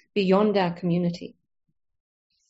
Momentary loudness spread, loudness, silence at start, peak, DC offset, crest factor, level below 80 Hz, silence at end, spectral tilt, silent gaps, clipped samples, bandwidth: 16 LU; -23 LUFS; 0.15 s; -8 dBFS; under 0.1%; 18 dB; -64 dBFS; 1.2 s; -6 dB/octave; none; under 0.1%; 7.6 kHz